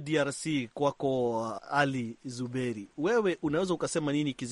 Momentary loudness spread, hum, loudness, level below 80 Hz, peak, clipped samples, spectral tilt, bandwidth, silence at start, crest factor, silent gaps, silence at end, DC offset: 8 LU; none; -31 LUFS; -66 dBFS; -12 dBFS; under 0.1%; -5 dB/octave; 11.5 kHz; 0 s; 18 dB; none; 0 s; under 0.1%